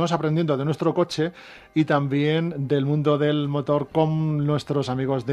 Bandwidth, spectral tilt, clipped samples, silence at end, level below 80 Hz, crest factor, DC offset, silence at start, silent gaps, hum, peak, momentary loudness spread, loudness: 10 kHz; -7.5 dB/octave; under 0.1%; 0 s; -58 dBFS; 18 dB; under 0.1%; 0 s; none; none; -6 dBFS; 4 LU; -23 LUFS